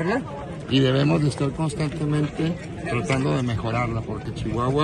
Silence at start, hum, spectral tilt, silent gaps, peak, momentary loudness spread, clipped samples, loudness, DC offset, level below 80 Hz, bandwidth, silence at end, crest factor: 0 s; none; -6.5 dB/octave; none; -8 dBFS; 9 LU; under 0.1%; -24 LUFS; under 0.1%; -42 dBFS; 10.5 kHz; 0 s; 14 dB